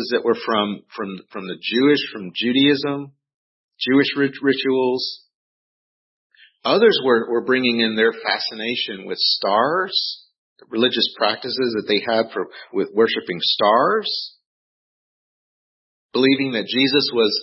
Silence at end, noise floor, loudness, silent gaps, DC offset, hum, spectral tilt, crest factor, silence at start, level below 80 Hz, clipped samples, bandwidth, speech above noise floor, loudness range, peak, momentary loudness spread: 0 s; under -90 dBFS; -19 LUFS; 3.34-3.68 s, 5.34-6.30 s, 10.38-10.56 s, 14.46-16.09 s; under 0.1%; none; -8 dB/octave; 18 dB; 0 s; -72 dBFS; under 0.1%; 5.8 kHz; over 71 dB; 3 LU; -2 dBFS; 11 LU